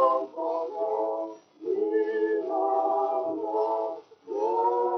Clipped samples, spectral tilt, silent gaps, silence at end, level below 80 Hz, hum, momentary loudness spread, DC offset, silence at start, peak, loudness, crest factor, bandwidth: under 0.1%; -3.5 dB/octave; none; 0 s; under -90 dBFS; none; 9 LU; under 0.1%; 0 s; -10 dBFS; -28 LUFS; 16 dB; 6.2 kHz